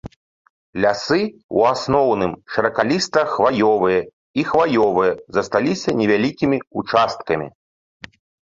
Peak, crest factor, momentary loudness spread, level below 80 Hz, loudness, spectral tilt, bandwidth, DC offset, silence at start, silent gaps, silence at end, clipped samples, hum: 0 dBFS; 18 dB; 7 LU; -52 dBFS; -19 LUFS; -5.5 dB/octave; 7.8 kHz; under 0.1%; 0.05 s; 0.16-0.73 s, 1.43-1.49 s, 4.13-4.34 s; 1 s; under 0.1%; none